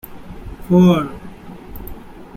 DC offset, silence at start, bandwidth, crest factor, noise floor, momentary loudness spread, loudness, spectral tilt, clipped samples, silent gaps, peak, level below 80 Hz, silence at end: under 0.1%; 0.1 s; 15 kHz; 16 dB; -35 dBFS; 25 LU; -15 LUFS; -8.5 dB/octave; under 0.1%; none; -2 dBFS; -38 dBFS; 0.1 s